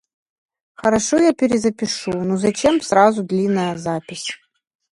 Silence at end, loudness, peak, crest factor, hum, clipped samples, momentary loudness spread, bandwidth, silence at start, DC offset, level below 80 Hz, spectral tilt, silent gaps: 0.6 s; -18 LUFS; 0 dBFS; 18 dB; none; under 0.1%; 11 LU; 11.5 kHz; 0.8 s; under 0.1%; -52 dBFS; -4.5 dB/octave; none